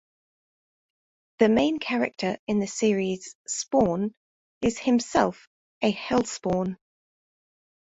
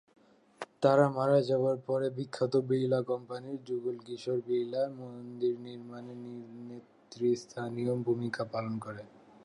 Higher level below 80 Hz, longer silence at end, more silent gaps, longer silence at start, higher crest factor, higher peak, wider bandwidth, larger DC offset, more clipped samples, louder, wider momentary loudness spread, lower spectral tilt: first, -58 dBFS vs -78 dBFS; first, 1.2 s vs 0.4 s; first, 2.39-2.47 s, 3.35-3.45 s, 4.17-4.61 s, 5.47-5.81 s vs none; first, 1.4 s vs 0.6 s; about the same, 22 dB vs 20 dB; first, -6 dBFS vs -12 dBFS; second, 8.2 kHz vs 11 kHz; neither; neither; first, -26 LUFS vs -32 LUFS; second, 9 LU vs 18 LU; second, -5 dB/octave vs -7.5 dB/octave